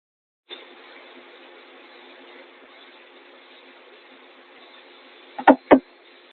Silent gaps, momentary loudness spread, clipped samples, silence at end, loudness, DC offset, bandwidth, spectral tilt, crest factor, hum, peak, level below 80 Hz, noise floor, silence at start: none; 29 LU; under 0.1%; 0.5 s; -18 LUFS; under 0.1%; 4.5 kHz; -3 dB/octave; 26 dB; none; 0 dBFS; -62 dBFS; -51 dBFS; 5.4 s